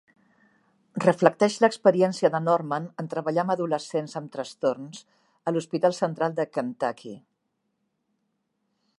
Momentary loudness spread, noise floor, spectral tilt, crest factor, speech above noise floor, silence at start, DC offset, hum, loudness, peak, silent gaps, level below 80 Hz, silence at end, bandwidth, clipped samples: 15 LU; -77 dBFS; -6 dB/octave; 26 dB; 52 dB; 0.95 s; under 0.1%; none; -25 LUFS; 0 dBFS; none; -78 dBFS; 1.8 s; 11.5 kHz; under 0.1%